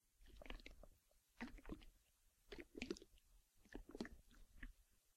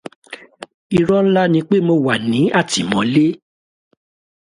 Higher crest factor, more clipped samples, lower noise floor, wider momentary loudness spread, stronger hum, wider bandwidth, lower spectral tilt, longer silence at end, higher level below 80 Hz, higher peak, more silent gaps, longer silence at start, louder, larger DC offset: first, 30 dB vs 16 dB; neither; first, -78 dBFS vs -36 dBFS; second, 11 LU vs 20 LU; neither; first, 16 kHz vs 11.5 kHz; about the same, -4.5 dB/octave vs -5.5 dB/octave; second, 0.05 s vs 1.05 s; second, -64 dBFS vs -54 dBFS; second, -28 dBFS vs -2 dBFS; second, none vs 0.74-0.90 s; second, 0.05 s vs 0.3 s; second, -58 LUFS vs -16 LUFS; neither